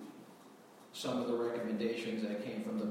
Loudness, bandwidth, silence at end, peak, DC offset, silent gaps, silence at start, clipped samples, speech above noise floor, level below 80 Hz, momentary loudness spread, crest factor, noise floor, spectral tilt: -38 LUFS; 16 kHz; 0 s; -24 dBFS; under 0.1%; none; 0 s; under 0.1%; 21 dB; -80 dBFS; 21 LU; 16 dB; -58 dBFS; -5.5 dB/octave